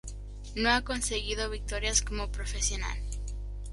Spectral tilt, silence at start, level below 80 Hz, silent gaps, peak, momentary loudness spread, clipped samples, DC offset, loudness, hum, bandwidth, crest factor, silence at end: -2.5 dB/octave; 0.05 s; -36 dBFS; none; -10 dBFS; 14 LU; under 0.1%; under 0.1%; -31 LUFS; 50 Hz at -35 dBFS; 11.5 kHz; 22 dB; 0 s